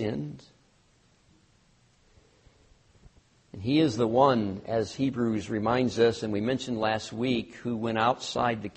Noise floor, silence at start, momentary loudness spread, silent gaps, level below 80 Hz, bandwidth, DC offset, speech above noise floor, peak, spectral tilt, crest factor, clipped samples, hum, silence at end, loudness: -64 dBFS; 0 s; 10 LU; none; -60 dBFS; 8.4 kHz; under 0.1%; 37 dB; -8 dBFS; -6 dB/octave; 20 dB; under 0.1%; none; 0.05 s; -27 LUFS